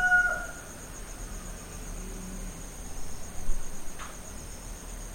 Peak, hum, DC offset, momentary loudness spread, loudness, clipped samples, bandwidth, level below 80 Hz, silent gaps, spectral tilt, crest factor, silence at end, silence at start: -14 dBFS; none; under 0.1%; 11 LU; -35 LUFS; under 0.1%; 16.5 kHz; -38 dBFS; none; -3 dB/octave; 18 dB; 0 s; 0 s